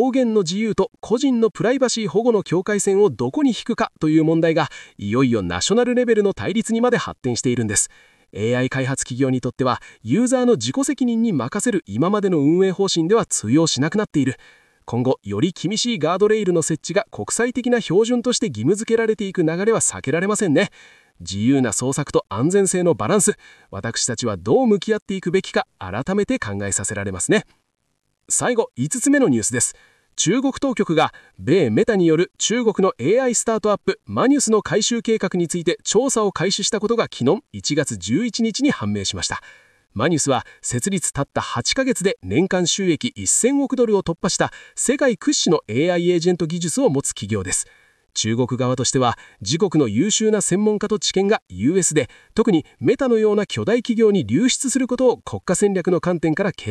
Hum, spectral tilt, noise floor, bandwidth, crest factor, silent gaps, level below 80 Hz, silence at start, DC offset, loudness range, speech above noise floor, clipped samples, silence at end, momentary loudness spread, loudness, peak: none; -4.5 dB/octave; -71 dBFS; 13 kHz; 14 dB; 25.02-25.06 s, 51.42-51.46 s; -54 dBFS; 0 s; under 0.1%; 3 LU; 52 dB; under 0.1%; 0 s; 6 LU; -19 LUFS; -6 dBFS